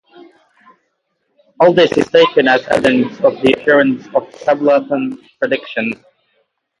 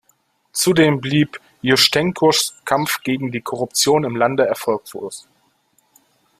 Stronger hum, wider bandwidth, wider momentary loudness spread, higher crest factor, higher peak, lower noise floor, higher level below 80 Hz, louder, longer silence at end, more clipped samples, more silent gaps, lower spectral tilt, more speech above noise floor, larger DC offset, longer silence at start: neither; second, 11 kHz vs 16 kHz; about the same, 10 LU vs 11 LU; about the same, 16 dB vs 20 dB; about the same, 0 dBFS vs 0 dBFS; first, -68 dBFS vs -62 dBFS; about the same, -54 dBFS vs -58 dBFS; first, -14 LUFS vs -17 LUFS; second, 0.85 s vs 1.2 s; neither; neither; first, -5.5 dB/octave vs -3.5 dB/octave; first, 55 dB vs 45 dB; neither; first, 1.6 s vs 0.55 s